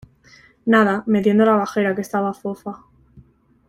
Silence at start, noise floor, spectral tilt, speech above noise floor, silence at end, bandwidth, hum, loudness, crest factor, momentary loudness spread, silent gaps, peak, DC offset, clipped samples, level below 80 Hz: 0.65 s; -51 dBFS; -7 dB/octave; 33 dB; 0.5 s; 13 kHz; none; -18 LUFS; 18 dB; 14 LU; none; -4 dBFS; under 0.1%; under 0.1%; -60 dBFS